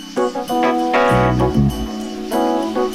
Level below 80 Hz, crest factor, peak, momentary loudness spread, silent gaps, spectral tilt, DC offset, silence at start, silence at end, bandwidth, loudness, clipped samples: -32 dBFS; 16 dB; -2 dBFS; 9 LU; none; -6.5 dB/octave; under 0.1%; 0 s; 0 s; 16 kHz; -17 LUFS; under 0.1%